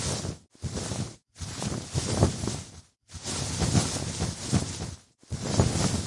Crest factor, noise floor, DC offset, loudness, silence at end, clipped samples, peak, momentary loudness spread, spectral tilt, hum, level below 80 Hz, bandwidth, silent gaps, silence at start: 26 dB; -50 dBFS; under 0.1%; -30 LUFS; 0 s; under 0.1%; -4 dBFS; 14 LU; -4.5 dB/octave; none; -44 dBFS; 11.5 kHz; none; 0 s